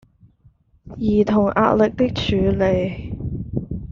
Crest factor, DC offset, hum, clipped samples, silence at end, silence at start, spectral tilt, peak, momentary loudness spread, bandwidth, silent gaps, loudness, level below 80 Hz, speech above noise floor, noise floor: 16 dB; under 0.1%; none; under 0.1%; 0 s; 0.85 s; -6 dB/octave; -4 dBFS; 12 LU; 7.2 kHz; none; -20 LUFS; -38 dBFS; 38 dB; -55 dBFS